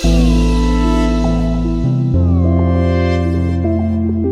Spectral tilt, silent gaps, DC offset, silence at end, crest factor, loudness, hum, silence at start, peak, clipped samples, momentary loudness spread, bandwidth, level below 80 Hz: -7.5 dB/octave; none; under 0.1%; 0 s; 12 dB; -15 LUFS; none; 0 s; -2 dBFS; under 0.1%; 3 LU; 11 kHz; -18 dBFS